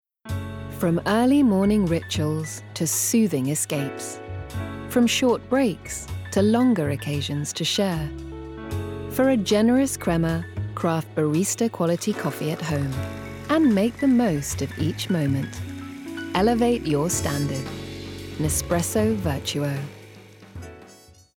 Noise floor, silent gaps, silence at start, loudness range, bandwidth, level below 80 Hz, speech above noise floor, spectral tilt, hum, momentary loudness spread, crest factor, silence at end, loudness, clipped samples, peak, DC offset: -50 dBFS; none; 0.25 s; 3 LU; 19.5 kHz; -46 dBFS; 28 dB; -5 dB/octave; none; 14 LU; 14 dB; 0.4 s; -23 LUFS; under 0.1%; -10 dBFS; under 0.1%